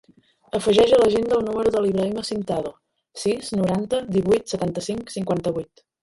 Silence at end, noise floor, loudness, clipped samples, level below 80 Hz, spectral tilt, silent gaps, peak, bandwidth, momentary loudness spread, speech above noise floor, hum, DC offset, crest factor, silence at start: 0.4 s; -45 dBFS; -22 LUFS; under 0.1%; -52 dBFS; -5.5 dB/octave; none; -6 dBFS; 11.5 kHz; 12 LU; 24 dB; none; under 0.1%; 16 dB; 0.55 s